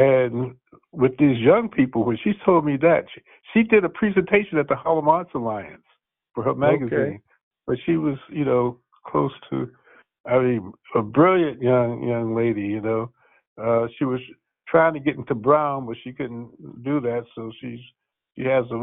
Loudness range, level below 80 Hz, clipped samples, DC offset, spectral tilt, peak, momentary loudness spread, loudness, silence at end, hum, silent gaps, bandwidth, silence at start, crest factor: 5 LU; -56 dBFS; under 0.1%; under 0.1%; -6.5 dB/octave; -2 dBFS; 16 LU; -22 LUFS; 0 s; none; 7.43-7.51 s, 10.20-10.24 s, 13.47-13.56 s; 3.9 kHz; 0 s; 20 dB